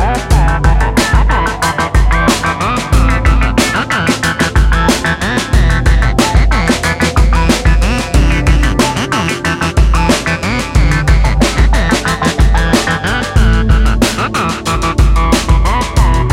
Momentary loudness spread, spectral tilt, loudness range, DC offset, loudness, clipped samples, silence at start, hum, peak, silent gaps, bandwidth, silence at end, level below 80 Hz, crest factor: 3 LU; -5 dB/octave; 1 LU; under 0.1%; -12 LUFS; under 0.1%; 0 s; none; 0 dBFS; none; 15 kHz; 0 s; -12 dBFS; 10 dB